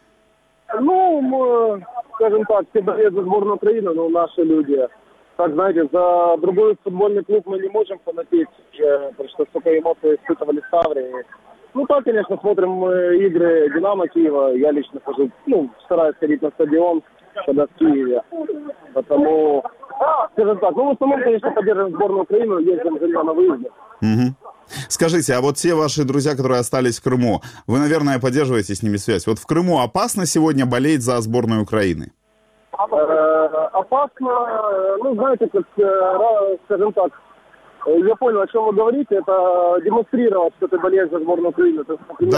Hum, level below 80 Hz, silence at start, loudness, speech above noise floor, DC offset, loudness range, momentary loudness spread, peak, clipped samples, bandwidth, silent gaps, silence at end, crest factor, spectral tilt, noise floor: none; -56 dBFS; 0.7 s; -18 LUFS; 41 dB; under 0.1%; 2 LU; 8 LU; -4 dBFS; under 0.1%; 15 kHz; none; 0 s; 14 dB; -6 dB/octave; -58 dBFS